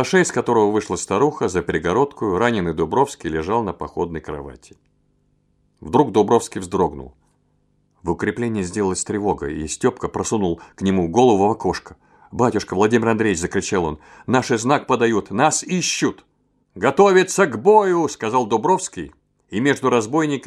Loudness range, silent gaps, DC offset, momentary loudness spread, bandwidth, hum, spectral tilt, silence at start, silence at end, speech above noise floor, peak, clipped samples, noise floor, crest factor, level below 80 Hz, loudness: 6 LU; none; under 0.1%; 11 LU; 13 kHz; 50 Hz at -50 dBFS; -5 dB/octave; 0 s; 0 s; 44 dB; -2 dBFS; under 0.1%; -63 dBFS; 18 dB; -48 dBFS; -19 LUFS